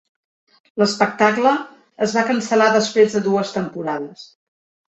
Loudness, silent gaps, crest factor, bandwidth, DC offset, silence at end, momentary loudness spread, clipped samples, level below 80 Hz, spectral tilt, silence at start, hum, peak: -18 LUFS; none; 18 dB; 8.2 kHz; under 0.1%; 0.7 s; 11 LU; under 0.1%; -64 dBFS; -4.5 dB/octave; 0.75 s; none; -2 dBFS